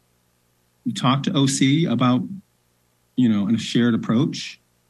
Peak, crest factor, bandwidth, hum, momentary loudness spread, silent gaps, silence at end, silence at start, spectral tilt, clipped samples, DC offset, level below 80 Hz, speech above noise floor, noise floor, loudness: -6 dBFS; 16 dB; 12 kHz; 60 Hz at -45 dBFS; 13 LU; none; 0.35 s; 0.85 s; -5.5 dB/octave; under 0.1%; under 0.1%; -66 dBFS; 45 dB; -65 dBFS; -21 LUFS